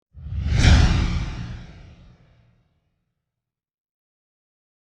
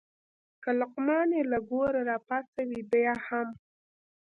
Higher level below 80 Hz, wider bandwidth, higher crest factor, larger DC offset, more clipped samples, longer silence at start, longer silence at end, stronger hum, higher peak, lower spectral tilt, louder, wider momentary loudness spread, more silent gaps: first, -28 dBFS vs -66 dBFS; first, 9.8 kHz vs 5.4 kHz; first, 22 dB vs 16 dB; neither; neither; second, 0.15 s vs 0.6 s; first, 3.3 s vs 0.7 s; neither; first, -2 dBFS vs -16 dBFS; second, -5.5 dB/octave vs -7.5 dB/octave; first, -20 LUFS vs -30 LUFS; first, 19 LU vs 8 LU; second, none vs 2.48-2.53 s